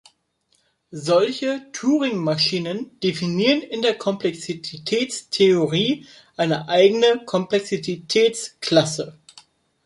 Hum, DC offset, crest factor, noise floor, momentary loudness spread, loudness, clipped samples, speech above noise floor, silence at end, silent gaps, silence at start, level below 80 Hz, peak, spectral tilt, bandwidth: none; under 0.1%; 18 dB; -67 dBFS; 12 LU; -21 LUFS; under 0.1%; 46 dB; 0.75 s; none; 0.9 s; -66 dBFS; -2 dBFS; -4.5 dB/octave; 11.5 kHz